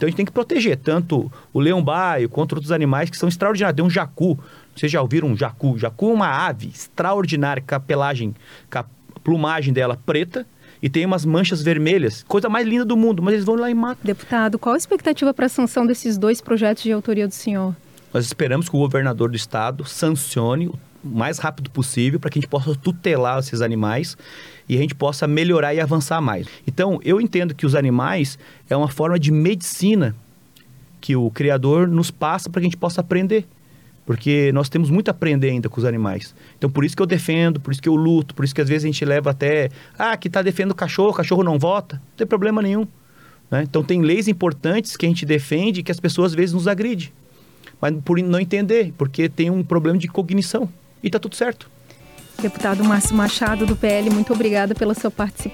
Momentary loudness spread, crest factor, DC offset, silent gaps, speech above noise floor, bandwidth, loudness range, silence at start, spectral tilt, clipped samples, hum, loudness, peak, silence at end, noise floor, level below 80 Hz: 8 LU; 12 dB; under 0.1%; none; 31 dB; 18 kHz; 3 LU; 0 s; -6 dB/octave; under 0.1%; none; -20 LUFS; -8 dBFS; 0 s; -50 dBFS; -48 dBFS